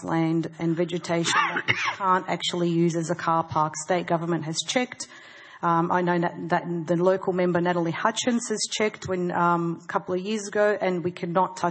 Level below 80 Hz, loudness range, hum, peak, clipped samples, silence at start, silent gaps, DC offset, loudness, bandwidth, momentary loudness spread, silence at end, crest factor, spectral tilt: -68 dBFS; 2 LU; none; -6 dBFS; under 0.1%; 0 s; none; under 0.1%; -25 LUFS; 8.8 kHz; 5 LU; 0 s; 20 dB; -4.5 dB/octave